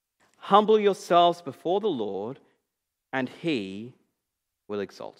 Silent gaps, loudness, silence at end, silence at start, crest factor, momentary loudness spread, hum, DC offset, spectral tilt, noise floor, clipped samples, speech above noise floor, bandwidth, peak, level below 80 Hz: none; -25 LUFS; 0.1 s; 0.45 s; 22 dB; 17 LU; none; under 0.1%; -5.5 dB/octave; -83 dBFS; under 0.1%; 59 dB; 12.5 kHz; -4 dBFS; -82 dBFS